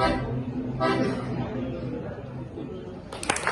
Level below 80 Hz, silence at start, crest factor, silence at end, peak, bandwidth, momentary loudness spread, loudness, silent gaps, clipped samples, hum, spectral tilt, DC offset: -44 dBFS; 0 s; 22 dB; 0 s; -8 dBFS; 12 kHz; 12 LU; -30 LUFS; none; under 0.1%; none; -5 dB/octave; under 0.1%